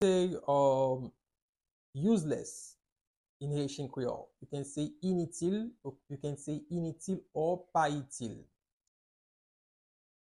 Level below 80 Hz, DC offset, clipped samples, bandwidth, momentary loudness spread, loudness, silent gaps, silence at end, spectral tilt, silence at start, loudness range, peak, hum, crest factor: -68 dBFS; under 0.1%; under 0.1%; 12 kHz; 16 LU; -35 LUFS; 1.42-1.53 s, 1.71-1.93 s, 2.92-2.96 s, 3.07-3.40 s; 1.8 s; -6 dB/octave; 0 s; 4 LU; -16 dBFS; none; 18 dB